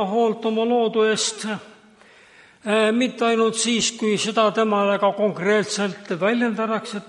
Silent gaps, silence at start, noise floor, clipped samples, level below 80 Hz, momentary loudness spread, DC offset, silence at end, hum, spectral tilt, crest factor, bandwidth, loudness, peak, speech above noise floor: none; 0 s; -50 dBFS; under 0.1%; -70 dBFS; 6 LU; under 0.1%; 0 s; none; -3.5 dB/octave; 16 dB; 11.5 kHz; -21 LUFS; -4 dBFS; 30 dB